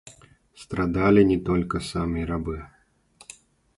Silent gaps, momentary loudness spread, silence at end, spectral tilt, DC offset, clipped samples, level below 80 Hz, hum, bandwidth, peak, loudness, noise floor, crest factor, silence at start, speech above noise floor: none; 24 LU; 1.1 s; -7 dB/octave; under 0.1%; under 0.1%; -42 dBFS; none; 11.5 kHz; -6 dBFS; -24 LUFS; -56 dBFS; 20 dB; 0.05 s; 34 dB